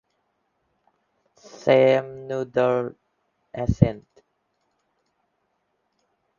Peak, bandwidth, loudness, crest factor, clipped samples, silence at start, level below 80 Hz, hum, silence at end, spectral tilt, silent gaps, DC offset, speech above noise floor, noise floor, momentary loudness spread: 0 dBFS; 7.2 kHz; -22 LUFS; 26 dB; under 0.1%; 1.65 s; -46 dBFS; none; 2.4 s; -8 dB/octave; none; under 0.1%; 52 dB; -73 dBFS; 16 LU